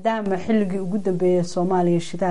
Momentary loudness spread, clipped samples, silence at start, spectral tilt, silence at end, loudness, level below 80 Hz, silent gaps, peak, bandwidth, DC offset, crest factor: 4 LU; under 0.1%; 0 s; -7 dB/octave; 0 s; -22 LUFS; -58 dBFS; none; -8 dBFS; 11 kHz; 3%; 14 dB